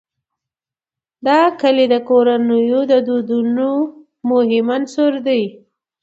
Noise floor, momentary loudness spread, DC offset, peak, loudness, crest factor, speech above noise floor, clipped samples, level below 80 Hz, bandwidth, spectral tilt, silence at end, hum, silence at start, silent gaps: -90 dBFS; 7 LU; under 0.1%; 0 dBFS; -15 LUFS; 16 dB; 75 dB; under 0.1%; -68 dBFS; 7.8 kHz; -6 dB/octave; 0.5 s; none; 1.25 s; none